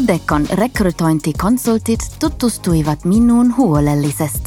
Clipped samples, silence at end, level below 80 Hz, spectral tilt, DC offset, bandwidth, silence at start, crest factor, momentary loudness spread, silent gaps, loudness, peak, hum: under 0.1%; 0 s; -30 dBFS; -6 dB/octave; under 0.1%; 16.5 kHz; 0 s; 12 dB; 6 LU; none; -15 LUFS; -2 dBFS; none